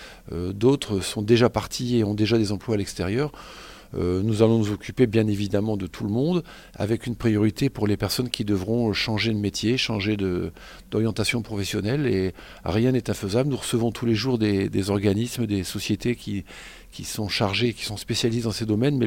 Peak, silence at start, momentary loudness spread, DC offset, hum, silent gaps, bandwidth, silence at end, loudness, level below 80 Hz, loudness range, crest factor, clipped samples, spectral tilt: -4 dBFS; 0 s; 10 LU; under 0.1%; none; none; 17 kHz; 0 s; -24 LUFS; -48 dBFS; 2 LU; 20 dB; under 0.1%; -5.5 dB/octave